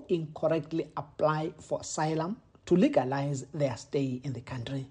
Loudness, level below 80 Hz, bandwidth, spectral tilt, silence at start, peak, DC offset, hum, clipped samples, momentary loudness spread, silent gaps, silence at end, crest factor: -31 LUFS; -64 dBFS; 10 kHz; -6.5 dB/octave; 0 s; -10 dBFS; under 0.1%; none; under 0.1%; 11 LU; none; 0 s; 20 dB